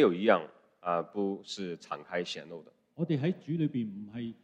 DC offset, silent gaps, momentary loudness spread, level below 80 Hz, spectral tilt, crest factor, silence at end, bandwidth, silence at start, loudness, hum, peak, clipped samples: under 0.1%; none; 14 LU; -78 dBFS; -6.5 dB/octave; 22 dB; 0.1 s; 9.2 kHz; 0 s; -33 LUFS; none; -10 dBFS; under 0.1%